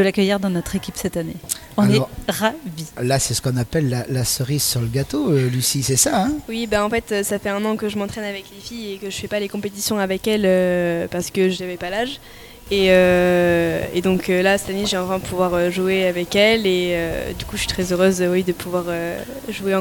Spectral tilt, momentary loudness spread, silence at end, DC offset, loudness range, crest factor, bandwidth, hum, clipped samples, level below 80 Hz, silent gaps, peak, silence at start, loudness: -4.5 dB/octave; 11 LU; 0 s; under 0.1%; 4 LU; 18 dB; 18 kHz; none; under 0.1%; -42 dBFS; none; 0 dBFS; 0 s; -20 LUFS